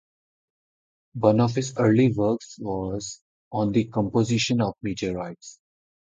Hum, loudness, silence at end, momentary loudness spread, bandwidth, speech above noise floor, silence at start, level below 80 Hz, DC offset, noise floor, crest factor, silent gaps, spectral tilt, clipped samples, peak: none; -24 LUFS; 0.65 s; 15 LU; 9.2 kHz; over 67 dB; 1.15 s; -54 dBFS; under 0.1%; under -90 dBFS; 22 dB; 3.22-3.51 s; -6 dB/octave; under 0.1%; -4 dBFS